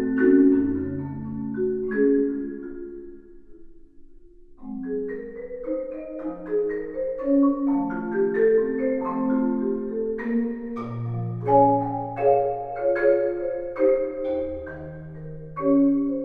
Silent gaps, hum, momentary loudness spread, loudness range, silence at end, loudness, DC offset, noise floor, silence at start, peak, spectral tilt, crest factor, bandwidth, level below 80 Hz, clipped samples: none; none; 16 LU; 10 LU; 0 s; -24 LUFS; under 0.1%; -46 dBFS; 0 s; -6 dBFS; -11.5 dB/octave; 18 dB; 3.6 kHz; -50 dBFS; under 0.1%